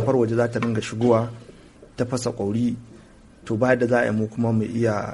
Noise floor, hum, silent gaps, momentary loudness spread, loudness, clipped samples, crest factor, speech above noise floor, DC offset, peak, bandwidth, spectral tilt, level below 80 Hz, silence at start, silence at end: -48 dBFS; none; none; 10 LU; -23 LUFS; under 0.1%; 18 dB; 26 dB; under 0.1%; -4 dBFS; 11.5 kHz; -7 dB/octave; -54 dBFS; 0 s; 0 s